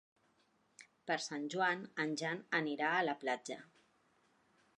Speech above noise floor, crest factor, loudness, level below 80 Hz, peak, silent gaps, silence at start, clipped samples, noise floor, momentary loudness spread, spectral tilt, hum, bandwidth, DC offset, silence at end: 37 dB; 20 dB; -37 LUFS; under -90 dBFS; -20 dBFS; none; 0.8 s; under 0.1%; -75 dBFS; 9 LU; -3.5 dB/octave; none; 11 kHz; under 0.1%; 1.1 s